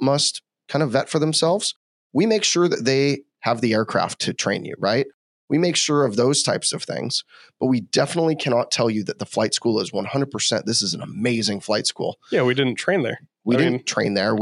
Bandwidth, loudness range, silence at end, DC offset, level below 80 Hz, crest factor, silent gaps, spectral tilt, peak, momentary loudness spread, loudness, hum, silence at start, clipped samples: 11.5 kHz; 2 LU; 0 s; under 0.1%; -74 dBFS; 18 dB; 1.76-2.10 s, 5.14-5.48 s; -4 dB/octave; -4 dBFS; 7 LU; -21 LUFS; none; 0 s; under 0.1%